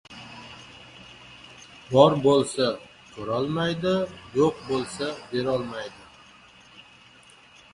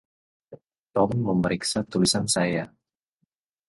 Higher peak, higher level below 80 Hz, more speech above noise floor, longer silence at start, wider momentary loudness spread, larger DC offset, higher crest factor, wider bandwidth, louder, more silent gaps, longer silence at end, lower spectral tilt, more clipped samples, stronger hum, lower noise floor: first, -2 dBFS vs -10 dBFS; second, -60 dBFS vs -54 dBFS; second, 29 dB vs 53 dB; second, 0.1 s vs 0.5 s; first, 26 LU vs 8 LU; neither; first, 26 dB vs 18 dB; about the same, 11.5 kHz vs 12 kHz; about the same, -24 LUFS vs -24 LUFS; second, none vs 0.78-0.84 s; about the same, 0.9 s vs 1 s; about the same, -5.5 dB/octave vs -4.5 dB/octave; neither; neither; second, -52 dBFS vs -77 dBFS